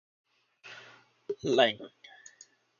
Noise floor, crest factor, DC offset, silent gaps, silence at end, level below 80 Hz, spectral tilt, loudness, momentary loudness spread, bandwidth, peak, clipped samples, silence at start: -60 dBFS; 26 dB; under 0.1%; none; 0.95 s; -74 dBFS; -4 dB/octave; -29 LUFS; 26 LU; 7.2 kHz; -8 dBFS; under 0.1%; 0.65 s